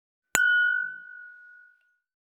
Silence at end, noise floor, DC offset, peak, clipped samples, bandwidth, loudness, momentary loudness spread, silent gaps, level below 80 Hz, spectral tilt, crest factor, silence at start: 1 s; -63 dBFS; under 0.1%; -2 dBFS; under 0.1%; 13 kHz; -24 LUFS; 23 LU; none; -72 dBFS; 1 dB/octave; 28 dB; 0.35 s